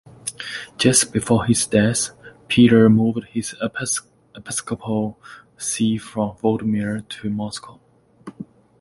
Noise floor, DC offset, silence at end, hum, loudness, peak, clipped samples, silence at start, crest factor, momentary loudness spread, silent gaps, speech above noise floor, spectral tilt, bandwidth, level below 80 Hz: -42 dBFS; under 0.1%; 0.35 s; none; -20 LUFS; -2 dBFS; under 0.1%; 0.25 s; 20 dB; 15 LU; none; 23 dB; -4.5 dB/octave; 11.5 kHz; -52 dBFS